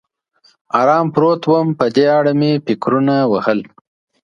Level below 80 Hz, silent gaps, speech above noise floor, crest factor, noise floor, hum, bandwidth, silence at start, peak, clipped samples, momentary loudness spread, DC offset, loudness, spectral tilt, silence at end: -60 dBFS; none; 42 dB; 16 dB; -56 dBFS; none; 7.4 kHz; 0.75 s; 0 dBFS; under 0.1%; 5 LU; under 0.1%; -15 LUFS; -8 dB/octave; 0.6 s